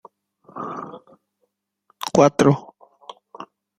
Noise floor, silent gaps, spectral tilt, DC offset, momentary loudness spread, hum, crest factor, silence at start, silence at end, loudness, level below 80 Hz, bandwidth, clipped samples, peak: -73 dBFS; none; -6 dB/octave; under 0.1%; 26 LU; none; 22 dB; 0.55 s; 0.35 s; -19 LUFS; -60 dBFS; 15.5 kHz; under 0.1%; -2 dBFS